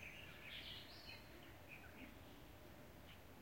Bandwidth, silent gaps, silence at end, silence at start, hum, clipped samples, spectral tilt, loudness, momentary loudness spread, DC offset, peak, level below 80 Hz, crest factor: 16.5 kHz; none; 0 s; 0 s; none; under 0.1%; -4 dB/octave; -57 LUFS; 9 LU; under 0.1%; -40 dBFS; -70 dBFS; 16 dB